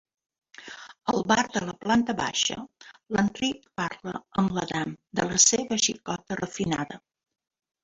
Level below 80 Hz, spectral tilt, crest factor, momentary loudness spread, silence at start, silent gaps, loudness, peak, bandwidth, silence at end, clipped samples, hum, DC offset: -58 dBFS; -2.5 dB/octave; 22 dB; 18 LU; 0.6 s; none; -26 LUFS; -6 dBFS; 8.2 kHz; 0.85 s; under 0.1%; none; under 0.1%